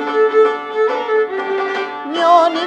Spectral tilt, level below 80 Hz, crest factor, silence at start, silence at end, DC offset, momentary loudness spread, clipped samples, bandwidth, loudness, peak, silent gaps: -3 dB/octave; -70 dBFS; 14 dB; 0 s; 0 s; under 0.1%; 9 LU; under 0.1%; 8.6 kHz; -16 LUFS; 0 dBFS; none